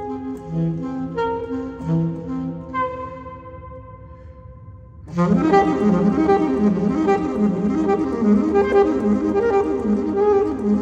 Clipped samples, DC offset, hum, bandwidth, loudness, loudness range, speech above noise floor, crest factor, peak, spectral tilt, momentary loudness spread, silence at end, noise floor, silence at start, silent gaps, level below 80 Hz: under 0.1%; under 0.1%; none; 8 kHz; -20 LUFS; 9 LU; 22 dB; 16 dB; -4 dBFS; -8.5 dB/octave; 14 LU; 0 s; -40 dBFS; 0 s; none; -44 dBFS